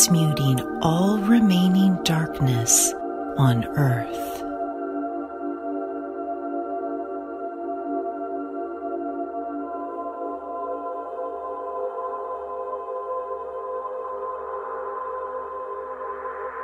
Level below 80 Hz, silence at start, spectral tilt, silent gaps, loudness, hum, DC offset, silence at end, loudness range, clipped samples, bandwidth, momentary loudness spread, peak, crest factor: -54 dBFS; 0 s; -5 dB/octave; none; -25 LUFS; none; under 0.1%; 0 s; 11 LU; under 0.1%; 16 kHz; 13 LU; -2 dBFS; 22 dB